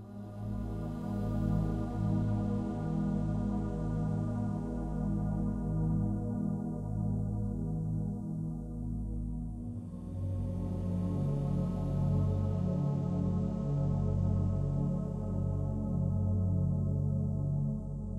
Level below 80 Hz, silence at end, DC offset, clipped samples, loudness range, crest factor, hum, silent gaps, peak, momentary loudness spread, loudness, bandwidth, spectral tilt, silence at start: -42 dBFS; 0 s; under 0.1%; under 0.1%; 5 LU; 14 dB; none; none; -20 dBFS; 7 LU; -34 LUFS; 8.8 kHz; -10.5 dB/octave; 0 s